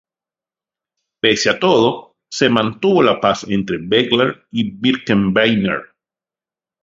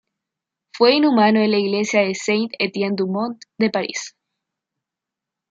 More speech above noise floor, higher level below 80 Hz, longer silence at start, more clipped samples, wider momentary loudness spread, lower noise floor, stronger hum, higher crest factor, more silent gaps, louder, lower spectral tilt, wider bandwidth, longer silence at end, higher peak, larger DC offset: first, over 75 dB vs 67 dB; first, -52 dBFS vs -70 dBFS; first, 1.25 s vs 0.75 s; neither; second, 8 LU vs 11 LU; first, under -90 dBFS vs -85 dBFS; neither; about the same, 18 dB vs 18 dB; neither; first, -16 LUFS vs -19 LUFS; about the same, -5 dB/octave vs -4.5 dB/octave; about the same, 7.8 kHz vs 7.8 kHz; second, 1 s vs 1.45 s; about the same, 0 dBFS vs -2 dBFS; neither